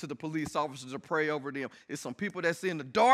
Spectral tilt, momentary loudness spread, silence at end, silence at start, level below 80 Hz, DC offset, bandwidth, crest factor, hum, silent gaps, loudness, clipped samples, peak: -4.5 dB/octave; 9 LU; 0 s; 0 s; -70 dBFS; under 0.1%; 15 kHz; 22 dB; none; none; -33 LUFS; under 0.1%; -10 dBFS